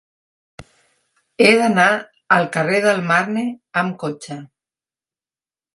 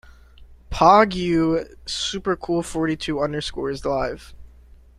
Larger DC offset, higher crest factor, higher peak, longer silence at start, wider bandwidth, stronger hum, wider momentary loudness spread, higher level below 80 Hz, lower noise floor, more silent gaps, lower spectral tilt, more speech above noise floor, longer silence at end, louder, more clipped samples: neither; about the same, 20 dB vs 20 dB; about the same, 0 dBFS vs -2 dBFS; first, 0.6 s vs 0.4 s; about the same, 11.5 kHz vs 12.5 kHz; neither; about the same, 14 LU vs 13 LU; second, -62 dBFS vs -42 dBFS; first, under -90 dBFS vs -48 dBFS; neither; about the same, -5 dB/octave vs -5 dB/octave; first, over 73 dB vs 27 dB; first, 1.3 s vs 0.5 s; first, -17 LUFS vs -21 LUFS; neither